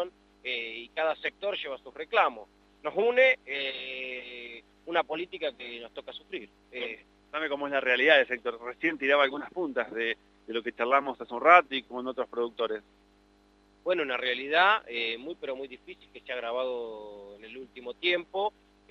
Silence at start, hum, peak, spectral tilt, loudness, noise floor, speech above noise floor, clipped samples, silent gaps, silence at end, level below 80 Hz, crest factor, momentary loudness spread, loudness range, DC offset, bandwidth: 0 s; none; -4 dBFS; -4 dB/octave; -28 LUFS; -63 dBFS; 33 dB; under 0.1%; none; 0.4 s; -68 dBFS; 26 dB; 20 LU; 8 LU; under 0.1%; 7 kHz